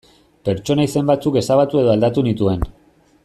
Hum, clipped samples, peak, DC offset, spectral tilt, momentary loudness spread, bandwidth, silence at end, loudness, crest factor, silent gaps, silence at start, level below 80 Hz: none; under 0.1%; -2 dBFS; under 0.1%; -7 dB/octave; 9 LU; 13.5 kHz; 0.55 s; -17 LUFS; 14 dB; none; 0.45 s; -38 dBFS